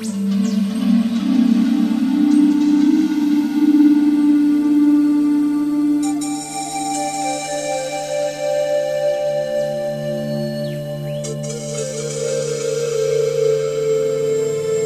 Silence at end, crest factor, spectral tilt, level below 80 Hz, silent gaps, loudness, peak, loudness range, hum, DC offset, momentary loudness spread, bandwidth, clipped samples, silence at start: 0 s; 14 dB; -5.5 dB/octave; -58 dBFS; none; -18 LUFS; -4 dBFS; 8 LU; none; under 0.1%; 10 LU; 14 kHz; under 0.1%; 0 s